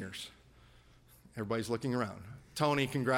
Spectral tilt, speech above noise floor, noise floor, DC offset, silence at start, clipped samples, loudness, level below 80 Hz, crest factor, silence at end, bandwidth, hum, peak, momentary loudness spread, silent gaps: -5.5 dB/octave; 28 dB; -61 dBFS; under 0.1%; 0 s; under 0.1%; -35 LUFS; -64 dBFS; 20 dB; 0 s; 16.5 kHz; none; -16 dBFS; 17 LU; none